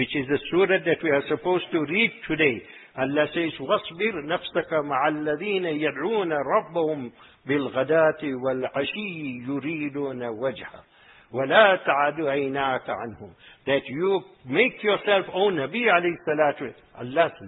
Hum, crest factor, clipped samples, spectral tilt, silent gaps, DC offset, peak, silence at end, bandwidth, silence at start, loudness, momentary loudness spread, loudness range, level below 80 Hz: none; 22 dB; under 0.1%; -9.5 dB/octave; none; under 0.1%; -2 dBFS; 0 s; 4.1 kHz; 0 s; -24 LUFS; 11 LU; 3 LU; -62 dBFS